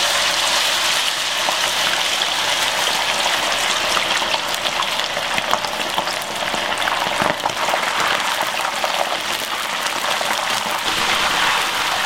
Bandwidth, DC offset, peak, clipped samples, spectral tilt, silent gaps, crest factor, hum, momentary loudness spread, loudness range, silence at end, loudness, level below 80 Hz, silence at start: 17 kHz; 0.4%; 0 dBFS; under 0.1%; 0 dB/octave; none; 20 dB; none; 5 LU; 3 LU; 0 s; -18 LUFS; -52 dBFS; 0 s